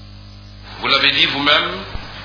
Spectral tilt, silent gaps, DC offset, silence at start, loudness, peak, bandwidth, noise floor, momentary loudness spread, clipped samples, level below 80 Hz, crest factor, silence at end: -4 dB/octave; none; under 0.1%; 0 s; -14 LUFS; 0 dBFS; 5.4 kHz; -37 dBFS; 18 LU; under 0.1%; -40 dBFS; 20 dB; 0 s